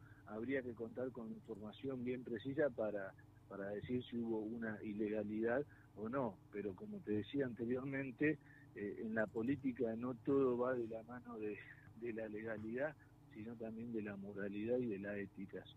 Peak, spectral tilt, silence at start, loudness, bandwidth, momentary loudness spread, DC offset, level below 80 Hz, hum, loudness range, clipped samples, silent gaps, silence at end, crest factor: -26 dBFS; -8.5 dB/octave; 0 s; -44 LUFS; 8 kHz; 11 LU; under 0.1%; -74 dBFS; none; 5 LU; under 0.1%; none; 0 s; 18 dB